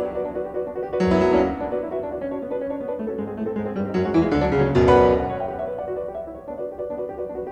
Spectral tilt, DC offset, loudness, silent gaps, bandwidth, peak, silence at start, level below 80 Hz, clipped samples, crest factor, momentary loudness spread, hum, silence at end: -8 dB/octave; under 0.1%; -23 LUFS; none; 8.6 kHz; -4 dBFS; 0 s; -40 dBFS; under 0.1%; 18 dB; 13 LU; none; 0 s